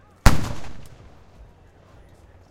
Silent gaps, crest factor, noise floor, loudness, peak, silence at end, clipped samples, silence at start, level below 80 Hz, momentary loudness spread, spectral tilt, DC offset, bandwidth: none; 22 dB; -50 dBFS; -24 LUFS; 0 dBFS; 1.65 s; 0.1%; 0.25 s; -28 dBFS; 27 LU; -5 dB/octave; under 0.1%; 16.5 kHz